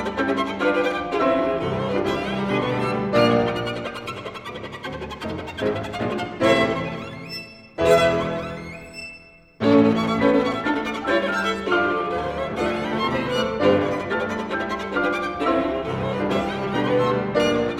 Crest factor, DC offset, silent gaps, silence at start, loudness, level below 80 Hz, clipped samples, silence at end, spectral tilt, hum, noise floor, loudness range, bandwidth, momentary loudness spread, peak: 18 dB; under 0.1%; none; 0 s; -22 LUFS; -48 dBFS; under 0.1%; 0 s; -6 dB/octave; none; -46 dBFS; 4 LU; 15.5 kHz; 14 LU; -4 dBFS